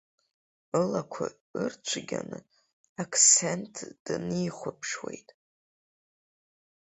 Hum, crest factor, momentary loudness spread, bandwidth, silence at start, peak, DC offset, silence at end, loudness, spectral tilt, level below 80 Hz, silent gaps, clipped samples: none; 26 dB; 22 LU; 8.2 kHz; 0.75 s; -6 dBFS; under 0.1%; 1.65 s; -27 LUFS; -2.5 dB/octave; -70 dBFS; 1.41-1.54 s, 2.73-2.96 s, 3.99-4.06 s; under 0.1%